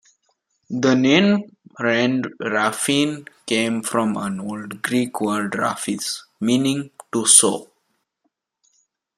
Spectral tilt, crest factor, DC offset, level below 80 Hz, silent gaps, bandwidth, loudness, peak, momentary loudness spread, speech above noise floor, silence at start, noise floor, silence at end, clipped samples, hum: -3 dB/octave; 22 dB; under 0.1%; -66 dBFS; none; 15.5 kHz; -19 LUFS; 0 dBFS; 14 LU; 53 dB; 0.7 s; -73 dBFS; 1.55 s; under 0.1%; none